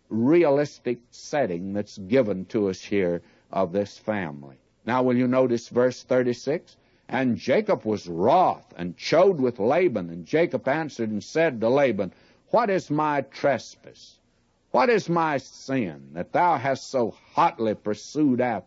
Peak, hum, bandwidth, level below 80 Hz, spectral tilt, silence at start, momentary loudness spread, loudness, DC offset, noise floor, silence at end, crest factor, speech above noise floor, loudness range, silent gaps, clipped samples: -8 dBFS; none; 8 kHz; -66 dBFS; -6.5 dB/octave; 0.1 s; 11 LU; -24 LUFS; under 0.1%; -66 dBFS; 0.05 s; 16 dB; 42 dB; 4 LU; none; under 0.1%